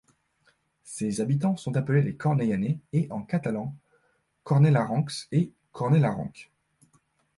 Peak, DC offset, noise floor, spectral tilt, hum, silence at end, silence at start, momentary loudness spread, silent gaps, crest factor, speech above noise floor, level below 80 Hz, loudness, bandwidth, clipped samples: -10 dBFS; under 0.1%; -70 dBFS; -7.5 dB/octave; none; 0.95 s; 0.85 s; 11 LU; none; 18 dB; 45 dB; -62 dBFS; -26 LUFS; 11.5 kHz; under 0.1%